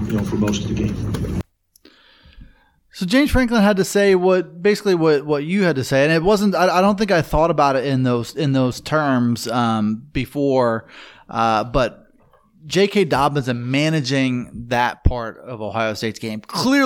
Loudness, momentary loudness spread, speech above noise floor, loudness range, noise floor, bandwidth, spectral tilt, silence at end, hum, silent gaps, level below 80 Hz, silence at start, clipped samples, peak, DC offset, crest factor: -19 LUFS; 10 LU; 36 dB; 5 LU; -54 dBFS; 17.5 kHz; -6 dB/octave; 0 s; none; none; -36 dBFS; 0 s; under 0.1%; -2 dBFS; under 0.1%; 16 dB